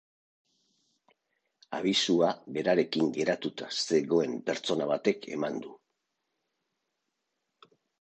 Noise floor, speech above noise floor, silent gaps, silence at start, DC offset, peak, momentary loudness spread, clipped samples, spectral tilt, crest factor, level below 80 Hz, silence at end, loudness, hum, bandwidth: -83 dBFS; 54 dB; none; 1.7 s; under 0.1%; -12 dBFS; 8 LU; under 0.1%; -4 dB/octave; 20 dB; -76 dBFS; 2.25 s; -29 LUFS; none; 9.4 kHz